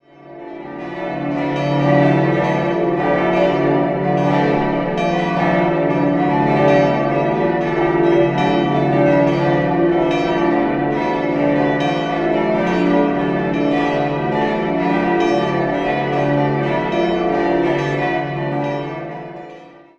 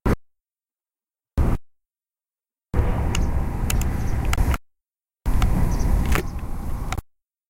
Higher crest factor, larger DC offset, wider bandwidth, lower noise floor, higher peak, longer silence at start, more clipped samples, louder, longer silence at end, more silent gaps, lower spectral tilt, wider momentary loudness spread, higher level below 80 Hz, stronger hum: about the same, 16 dB vs 20 dB; neither; second, 7.4 kHz vs 17 kHz; second, -39 dBFS vs under -90 dBFS; about the same, -2 dBFS vs -2 dBFS; first, 0.25 s vs 0.05 s; neither; first, -17 LUFS vs -26 LUFS; second, 0.3 s vs 0.45 s; neither; first, -8 dB/octave vs -6 dB/octave; about the same, 7 LU vs 9 LU; second, -44 dBFS vs -24 dBFS; neither